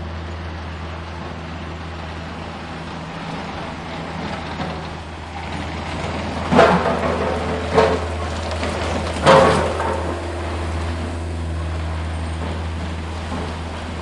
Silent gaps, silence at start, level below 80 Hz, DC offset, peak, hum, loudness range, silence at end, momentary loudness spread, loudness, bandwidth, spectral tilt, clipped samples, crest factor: none; 0 s; -36 dBFS; 0.2%; 0 dBFS; none; 12 LU; 0 s; 16 LU; -22 LUFS; 11.5 kHz; -6 dB/octave; under 0.1%; 22 dB